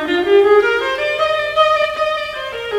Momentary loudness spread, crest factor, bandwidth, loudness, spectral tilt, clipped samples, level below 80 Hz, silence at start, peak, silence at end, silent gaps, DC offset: 10 LU; 14 dB; 12.5 kHz; -15 LUFS; -3.5 dB/octave; under 0.1%; -48 dBFS; 0 s; -2 dBFS; 0 s; none; under 0.1%